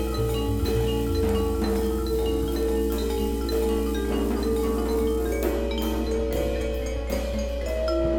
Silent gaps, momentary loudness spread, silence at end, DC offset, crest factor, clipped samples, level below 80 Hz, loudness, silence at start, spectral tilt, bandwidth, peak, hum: none; 4 LU; 0 s; under 0.1%; 14 dB; under 0.1%; -30 dBFS; -26 LUFS; 0 s; -6.5 dB/octave; 18.5 kHz; -12 dBFS; none